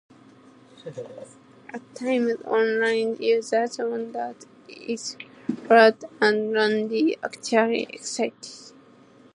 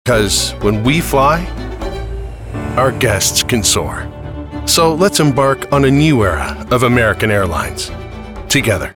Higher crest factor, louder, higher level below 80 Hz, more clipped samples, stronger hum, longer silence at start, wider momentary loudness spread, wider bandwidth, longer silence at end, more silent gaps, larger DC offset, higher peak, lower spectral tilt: first, 22 dB vs 14 dB; second, -23 LUFS vs -13 LUFS; second, -80 dBFS vs -28 dBFS; neither; neither; first, 0.85 s vs 0.05 s; first, 21 LU vs 15 LU; second, 11 kHz vs 19.5 kHz; first, 0.65 s vs 0 s; neither; neither; about the same, -2 dBFS vs -2 dBFS; about the same, -3.5 dB/octave vs -4 dB/octave